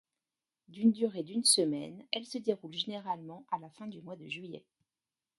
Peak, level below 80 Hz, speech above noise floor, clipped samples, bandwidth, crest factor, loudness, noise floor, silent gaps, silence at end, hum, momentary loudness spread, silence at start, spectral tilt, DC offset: -12 dBFS; -82 dBFS; over 56 dB; under 0.1%; 12 kHz; 24 dB; -33 LUFS; under -90 dBFS; none; 0.8 s; none; 20 LU; 0.7 s; -3 dB/octave; under 0.1%